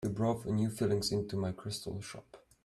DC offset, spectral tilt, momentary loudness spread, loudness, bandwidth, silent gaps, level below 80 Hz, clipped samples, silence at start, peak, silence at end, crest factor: under 0.1%; -6 dB/octave; 12 LU; -35 LUFS; 14 kHz; none; -62 dBFS; under 0.1%; 0 s; -20 dBFS; 0.25 s; 14 dB